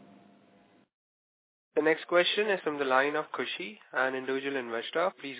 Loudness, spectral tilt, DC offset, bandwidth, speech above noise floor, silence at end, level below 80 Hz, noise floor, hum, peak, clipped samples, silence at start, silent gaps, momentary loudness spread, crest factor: -29 LUFS; -1 dB/octave; under 0.1%; 4 kHz; 33 dB; 0 s; under -90 dBFS; -63 dBFS; none; -12 dBFS; under 0.1%; 1.75 s; none; 9 LU; 20 dB